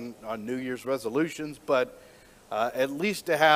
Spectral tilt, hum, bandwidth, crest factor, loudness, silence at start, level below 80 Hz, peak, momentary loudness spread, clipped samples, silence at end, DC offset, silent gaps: -4 dB/octave; none; 16 kHz; 22 dB; -29 LUFS; 0 s; -66 dBFS; -6 dBFS; 8 LU; under 0.1%; 0 s; under 0.1%; none